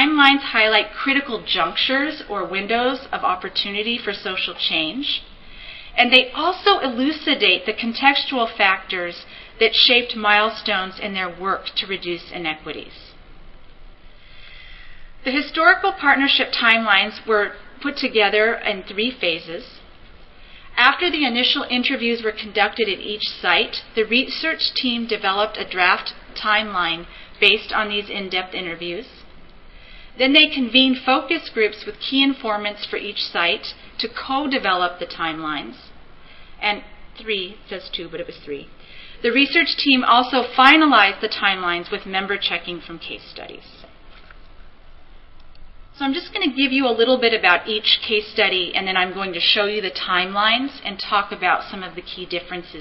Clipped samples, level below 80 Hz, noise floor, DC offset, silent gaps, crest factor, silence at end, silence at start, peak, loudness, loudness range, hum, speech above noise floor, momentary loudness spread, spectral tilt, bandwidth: under 0.1%; -48 dBFS; -43 dBFS; 0.1%; none; 20 dB; 0 s; 0 s; 0 dBFS; -18 LUFS; 10 LU; none; 23 dB; 14 LU; -5 dB/octave; 6 kHz